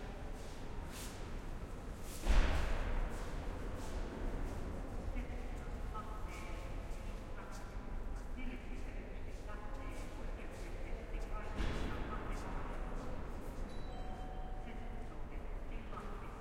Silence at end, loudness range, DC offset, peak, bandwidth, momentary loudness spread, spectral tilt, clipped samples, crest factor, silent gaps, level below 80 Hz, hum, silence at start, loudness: 0 s; 6 LU; under 0.1%; -18 dBFS; 15.5 kHz; 8 LU; -5.5 dB/octave; under 0.1%; 22 dB; none; -42 dBFS; none; 0 s; -46 LUFS